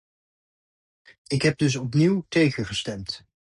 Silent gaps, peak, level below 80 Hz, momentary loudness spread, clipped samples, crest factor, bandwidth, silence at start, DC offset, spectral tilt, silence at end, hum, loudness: none; -8 dBFS; -54 dBFS; 12 LU; under 0.1%; 18 dB; 11 kHz; 1.3 s; under 0.1%; -5.5 dB/octave; 0.35 s; none; -24 LUFS